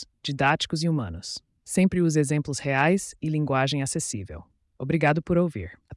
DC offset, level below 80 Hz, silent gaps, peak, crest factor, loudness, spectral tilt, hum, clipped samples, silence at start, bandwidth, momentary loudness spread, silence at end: under 0.1%; -54 dBFS; none; -8 dBFS; 16 dB; -25 LUFS; -5 dB/octave; none; under 0.1%; 0 s; 12 kHz; 14 LU; 0 s